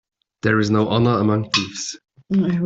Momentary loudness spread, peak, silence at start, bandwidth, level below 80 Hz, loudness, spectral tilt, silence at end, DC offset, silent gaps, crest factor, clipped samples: 11 LU; -2 dBFS; 0.45 s; 8 kHz; -54 dBFS; -20 LUFS; -5.5 dB/octave; 0 s; under 0.1%; none; 16 dB; under 0.1%